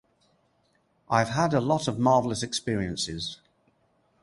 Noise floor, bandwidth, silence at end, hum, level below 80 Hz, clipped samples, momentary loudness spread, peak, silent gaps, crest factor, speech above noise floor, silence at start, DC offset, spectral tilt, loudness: -69 dBFS; 11.5 kHz; 0.85 s; none; -54 dBFS; under 0.1%; 10 LU; -6 dBFS; none; 22 dB; 43 dB; 1.1 s; under 0.1%; -5 dB/octave; -26 LUFS